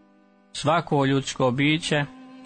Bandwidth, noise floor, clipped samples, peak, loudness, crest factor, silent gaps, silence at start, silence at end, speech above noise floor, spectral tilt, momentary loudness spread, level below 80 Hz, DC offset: 9.6 kHz; -57 dBFS; under 0.1%; -10 dBFS; -23 LUFS; 14 dB; none; 0.55 s; 0 s; 35 dB; -5 dB/octave; 8 LU; -56 dBFS; under 0.1%